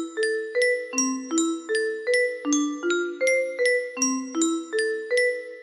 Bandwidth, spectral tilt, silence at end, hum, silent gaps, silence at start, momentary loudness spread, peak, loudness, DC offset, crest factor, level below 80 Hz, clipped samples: 15 kHz; 0 dB/octave; 0 s; none; none; 0 s; 3 LU; -10 dBFS; -24 LUFS; under 0.1%; 14 dB; -74 dBFS; under 0.1%